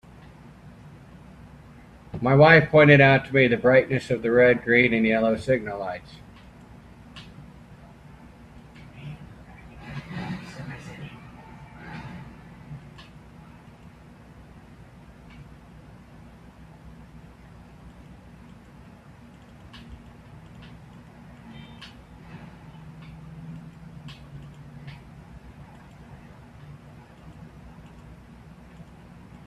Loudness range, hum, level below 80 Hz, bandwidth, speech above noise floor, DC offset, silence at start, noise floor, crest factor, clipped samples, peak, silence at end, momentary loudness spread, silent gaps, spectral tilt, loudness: 28 LU; none; -52 dBFS; 10 kHz; 30 dB; under 0.1%; 2.15 s; -48 dBFS; 26 dB; under 0.1%; -2 dBFS; 0.65 s; 29 LU; none; -7.5 dB/octave; -19 LUFS